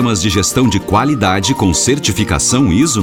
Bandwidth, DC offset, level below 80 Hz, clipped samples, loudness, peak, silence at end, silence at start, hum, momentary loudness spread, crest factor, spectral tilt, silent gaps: 17.5 kHz; 0.3%; -30 dBFS; under 0.1%; -12 LUFS; 0 dBFS; 0 s; 0 s; none; 2 LU; 12 dB; -4 dB/octave; none